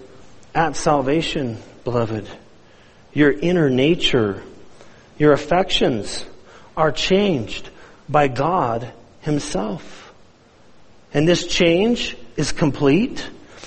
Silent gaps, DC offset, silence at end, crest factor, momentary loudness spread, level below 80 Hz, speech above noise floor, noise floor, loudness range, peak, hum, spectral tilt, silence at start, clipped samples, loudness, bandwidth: none; under 0.1%; 0 s; 18 dB; 14 LU; -40 dBFS; 32 dB; -51 dBFS; 4 LU; -2 dBFS; none; -5 dB/octave; 0 s; under 0.1%; -19 LUFS; 8.8 kHz